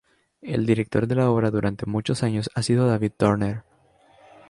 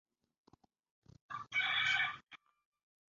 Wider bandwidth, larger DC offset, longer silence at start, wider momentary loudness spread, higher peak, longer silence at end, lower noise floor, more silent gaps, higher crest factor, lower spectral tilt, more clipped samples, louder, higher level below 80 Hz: first, 11.5 kHz vs 7.4 kHz; neither; second, 0.45 s vs 1.3 s; second, 8 LU vs 18 LU; first, -4 dBFS vs -22 dBFS; first, 0.9 s vs 0.7 s; second, -58 dBFS vs -71 dBFS; neither; about the same, 18 dB vs 20 dB; first, -7 dB/octave vs 3 dB/octave; neither; first, -23 LUFS vs -34 LUFS; first, -50 dBFS vs -78 dBFS